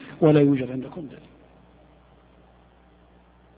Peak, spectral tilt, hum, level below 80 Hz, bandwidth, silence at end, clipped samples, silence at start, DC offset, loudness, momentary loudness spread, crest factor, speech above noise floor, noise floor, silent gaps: -6 dBFS; -8 dB/octave; 60 Hz at -60 dBFS; -58 dBFS; 4.7 kHz; 2.4 s; under 0.1%; 0 s; under 0.1%; -21 LUFS; 22 LU; 20 dB; 34 dB; -55 dBFS; none